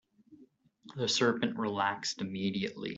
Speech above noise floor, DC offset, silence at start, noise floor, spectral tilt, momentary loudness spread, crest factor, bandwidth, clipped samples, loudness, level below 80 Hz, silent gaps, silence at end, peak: 30 dB; under 0.1%; 0.3 s; -62 dBFS; -4 dB/octave; 7 LU; 20 dB; 8.2 kHz; under 0.1%; -32 LUFS; -74 dBFS; none; 0 s; -14 dBFS